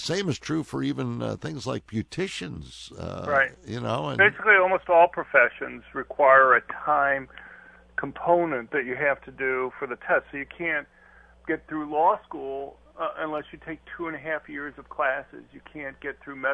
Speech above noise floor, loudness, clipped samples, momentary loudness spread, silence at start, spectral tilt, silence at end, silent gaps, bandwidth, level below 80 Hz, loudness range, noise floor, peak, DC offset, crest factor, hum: 29 dB; -25 LUFS; under 0.1%; 17 LU; 0 s; -5.5 dB/octave; 0 s; none; 11 kHz; -58 dBFS; 11 LU; -54 dBFS; -4 dBFS; under 0.1%; 22 dB; none